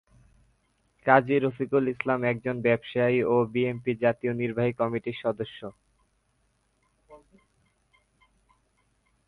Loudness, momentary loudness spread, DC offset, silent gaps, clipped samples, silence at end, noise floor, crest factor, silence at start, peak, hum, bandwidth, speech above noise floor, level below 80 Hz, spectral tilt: -26 LUFS; 9 LU; under 0.1%; none; under 0.1%; 2.1 s; -71 dBFS; 24 dB; 1.05 s; -4 dBFS; none; 10.5 kHz; 45 dB; -64 dBFS; -9 dB/octave